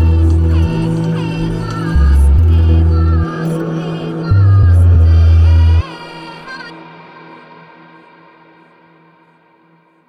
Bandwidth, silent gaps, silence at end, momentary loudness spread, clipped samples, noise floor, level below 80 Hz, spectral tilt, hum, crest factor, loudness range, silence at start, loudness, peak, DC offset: 6 kHz; none; 3.2 s; 19 LU; under 0.1%; -51 dBFS; -20 dBFS; -8.5 dB/octave; none; 10 dB; 7 LU; 0 s; -12 LUFS; -2 dBFS; under 0.1%